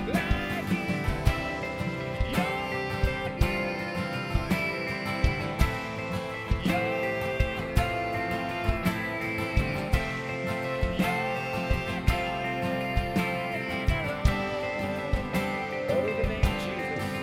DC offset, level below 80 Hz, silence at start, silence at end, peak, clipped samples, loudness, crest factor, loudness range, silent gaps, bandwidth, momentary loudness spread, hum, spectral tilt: under 0.1%; -34 dBFS; 0 s; 0 s; -8 dBFS; under 0.1%; -29 LUFS; 20 dB; 1 LU; none; 16 kHz; 4 LU; none; -6 dB/octave